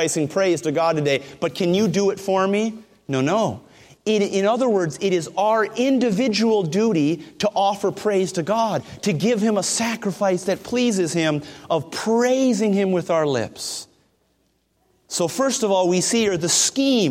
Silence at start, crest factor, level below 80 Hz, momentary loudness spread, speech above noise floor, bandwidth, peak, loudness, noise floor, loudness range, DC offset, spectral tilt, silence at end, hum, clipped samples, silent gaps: 0 s; 16 dB; -62 dBFS; 6 LU; 46 dB; 16.5 kHz; -6 dBFS; -21 LUFS; -66 dBFS; 3 LU; under 0.1%; -4.5 dB/octave; 0 s; none; under 0.1%; none